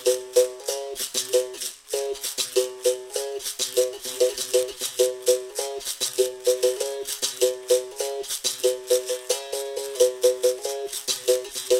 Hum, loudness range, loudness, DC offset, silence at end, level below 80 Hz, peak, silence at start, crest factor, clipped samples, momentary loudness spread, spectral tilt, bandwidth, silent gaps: none; 2 LU; -25 LUFS; under 0.1%; 0 s; -66 dBFS; -6 dBFS; 0 s; 18 dB; under 0.1%; 8 LU; 0 dB/octave; 17 kHz; none